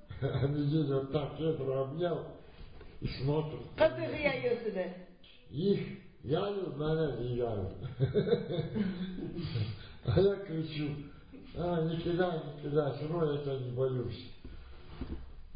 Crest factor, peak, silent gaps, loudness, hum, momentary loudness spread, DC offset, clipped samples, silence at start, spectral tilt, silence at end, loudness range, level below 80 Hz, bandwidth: 20 dB; -14 dBFS; none; -34 LUFS; none; 17 LU; under 0.1%; under 0.1%; 0.05 s; -6.5 dB/octave; 0 s; 2 LU; -52 dBFS; 5 kHz